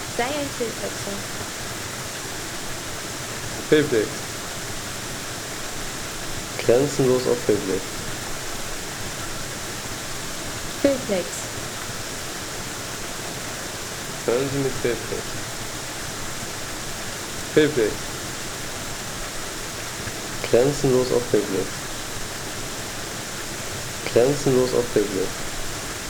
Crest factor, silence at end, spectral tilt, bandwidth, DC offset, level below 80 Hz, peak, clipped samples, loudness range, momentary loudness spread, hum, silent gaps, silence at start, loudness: 22 dB; 0 s; -3.5 dB/octave; over 20 kHz; under 0.1%; -42 dBFS; -4 dBFS; under 0.1%; 4 LU; 10 LU; none; none; 0 s; -25 LUFS